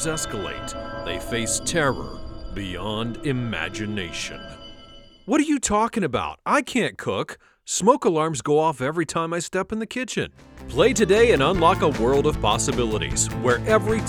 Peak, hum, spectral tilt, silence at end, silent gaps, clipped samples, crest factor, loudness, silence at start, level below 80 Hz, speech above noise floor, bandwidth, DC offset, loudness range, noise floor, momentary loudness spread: -2 dBFS; none; -4 dB/octave; 0 s; none; under 0.1%; 20 dB; -22 LUFS; 0 s; -40 dBFS; 24 dB; 17.5 kHz; under 0.1%; 7 LU; -46 dBFS; 14 LU